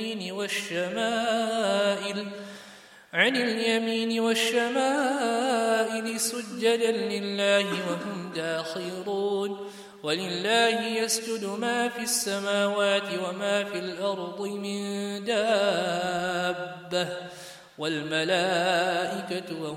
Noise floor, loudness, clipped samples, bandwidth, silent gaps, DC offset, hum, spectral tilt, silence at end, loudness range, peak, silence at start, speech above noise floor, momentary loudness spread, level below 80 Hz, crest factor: -50 dBFS; -27 LUFS; under 0.1%; 16 kHz; none; under 0.1%; none; -3 dB/octave; 0 s; 3 LU; -8 dBFS; 0 s; 23 dB; 10 LU; -74 dBFS; 20 dB